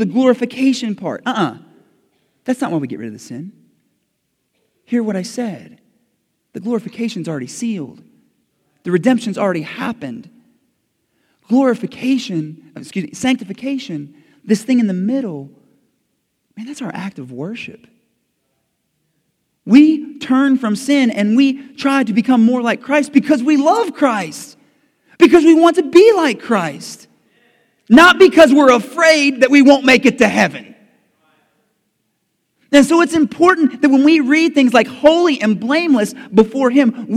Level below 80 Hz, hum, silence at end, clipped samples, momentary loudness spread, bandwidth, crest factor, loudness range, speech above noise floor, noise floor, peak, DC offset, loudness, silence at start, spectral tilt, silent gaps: -56 dBFS; none; 0 s; 0.2%; 19 LU; 14 kHz; 14 dB; 15 LU; 56 dB; -69 dBFS; 0 dBFS; under 0.1%; -13 LUFS; 0 s; -5 dB/octave; none